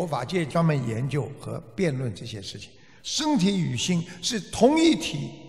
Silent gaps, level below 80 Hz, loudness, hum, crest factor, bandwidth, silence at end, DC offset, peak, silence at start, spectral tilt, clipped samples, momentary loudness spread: none; -54 dBFS; -25 LUFS; none; 18 dB; 14 kHz; 0 s; 0.2%; -6 dBFS; 0 s; -5 dB/octave; under 0.1%; 15 LU